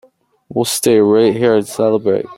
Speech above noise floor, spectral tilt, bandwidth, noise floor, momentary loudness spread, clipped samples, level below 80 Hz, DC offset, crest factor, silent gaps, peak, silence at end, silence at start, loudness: 27 dB; -4.5 dB/octave; 16.5 kHz; -40 dBFS; 7 LU; under 0.1%; -58 dBFS; under 0.1%; 12 dB; none; -2 dBFS; 0.05 s; 0.5 s; -14 LUFS